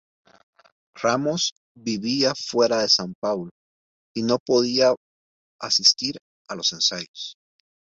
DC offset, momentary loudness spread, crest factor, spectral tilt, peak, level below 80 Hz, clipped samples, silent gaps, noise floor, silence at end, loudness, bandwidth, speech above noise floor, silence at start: under 0.1%; 17 LU; 22 dB; -3 dB/octave; -4 dBFS; -66 dBFS; under 0.1%; 1.52-1.75 s, 3.15-3.22 s, 3.51-4.15 s, 4.40-4.46 s, 4.97-5.59 s, 6.21-6.45 s, 7.08-7.14 s; under -90 dBFS; 0.5 s; -22 LUFS; 8 kHz; over 68 dB; 0.95 s